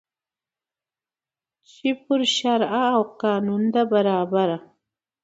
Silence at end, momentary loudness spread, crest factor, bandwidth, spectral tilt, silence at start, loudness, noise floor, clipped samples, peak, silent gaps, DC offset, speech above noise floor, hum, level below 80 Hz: 0.65 s; 7 LU; 16 dB; 8.2 kHz; -5 dB/octave; 1.85 s; -22 LUFS; under -90 dBFS; under 0.1%; -8 dBFS; none; under 0.1%; over 69 dB; none; -70 dBFS